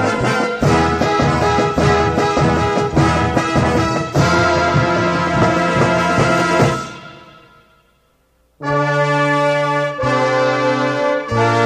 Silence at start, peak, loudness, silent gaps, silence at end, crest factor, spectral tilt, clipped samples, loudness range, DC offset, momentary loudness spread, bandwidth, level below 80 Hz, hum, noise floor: 0 s; -2 dBFS; -15 LUFS; none; 0 s; 14 dB; -6 dB/octave; under 0.1%; 4 LU; under 0.1%; 3 LU; 13.5 kHz; -34 dBFS; none; -58 dBFS